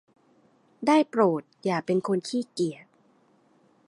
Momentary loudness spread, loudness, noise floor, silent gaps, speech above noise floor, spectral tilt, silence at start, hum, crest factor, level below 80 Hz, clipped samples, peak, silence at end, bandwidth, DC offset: 9 LU; -26 LUFS; -63 dBFS; none; 38 dB; -6 dB/octave; 0.8 s; none; 20 dB; -78 dBFS; under 0.1%; -8 dBFS; 1.15 s; 11.5 kHz; under 0.1%